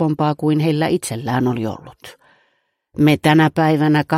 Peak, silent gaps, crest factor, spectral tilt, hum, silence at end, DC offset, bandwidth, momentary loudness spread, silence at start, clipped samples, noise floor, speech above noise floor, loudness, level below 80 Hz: 0 dBFS; none; 16 dB; -6.5 dB/octave; none; 0 s; under 0.1%; 15 kHz; 11 LU; 0 s; under 0.1%; -66 dBFS; 50 dB; -17 LUFS; -54 dBFS